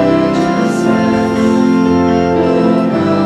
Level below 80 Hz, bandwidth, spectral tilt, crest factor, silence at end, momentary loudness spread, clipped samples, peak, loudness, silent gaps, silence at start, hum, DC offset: -40 dBFS; 11.5 kHz; -7 dB/octave; 10 dB; 0 s; 2 LU; under 0.1%; -2 dBFS; -12 LUFS; none; 0 s; none; under 0.1%